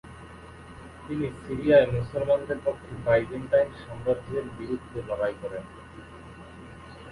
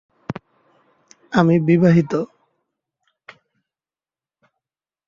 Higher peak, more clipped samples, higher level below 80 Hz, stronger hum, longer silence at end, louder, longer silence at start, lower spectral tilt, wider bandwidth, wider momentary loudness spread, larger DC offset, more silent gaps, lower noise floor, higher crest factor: second, -8 dBFS vs -2 dBFS; neither; first, -50 dBFS vs -58 dBFS; neither; second, 0 s vs 2.8 s; second, -27 LUFS vs -17 LUFS; second, 0.05 s vs 0.3 s; about the same, -7.5 dB/octave vs -8.5 dB/octave; first, 11.5 kHz vs 7.2 kHz; first, 23 LU vs 19 LU; neither; neither; second, -45 dBFS vs under -90 dBFS; about the same, 20 dB vs 20 dB